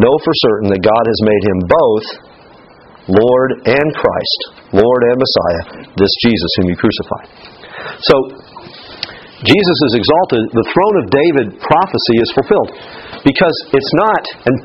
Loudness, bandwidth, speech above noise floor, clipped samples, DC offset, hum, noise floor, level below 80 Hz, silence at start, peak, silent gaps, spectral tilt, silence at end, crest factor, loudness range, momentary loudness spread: -12 LUFS; 7.8 kHz; 28 dB; 0.1%; under 0.1%; none; -40 dBFS; -42 dBFS; 0 s; 0 dBFS; none; -7.5 dB/octave; 0 s; 12 dB; 3 LU; 15 LU